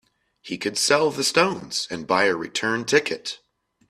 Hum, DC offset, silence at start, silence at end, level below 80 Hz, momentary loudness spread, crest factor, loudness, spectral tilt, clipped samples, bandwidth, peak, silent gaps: none; under 0.1%; 0.45 s; 0.55 s; -64 dBFS; 11 LU; 20 dB; -22 LUFS; -2.5 dB/octave; under 0.1%; 15 kHz; -4 dBFS; none